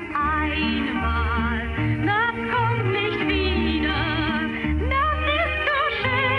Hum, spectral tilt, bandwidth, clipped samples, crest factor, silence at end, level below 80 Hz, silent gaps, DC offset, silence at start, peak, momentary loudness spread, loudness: none; -7.5 dB/octave; 5.8 kHz; under 0.1%; 12 dB; 0 s; -32 dBFS; none; under 0.1%; 0 s; -12 dBFS; 3 LU; -22 LUFS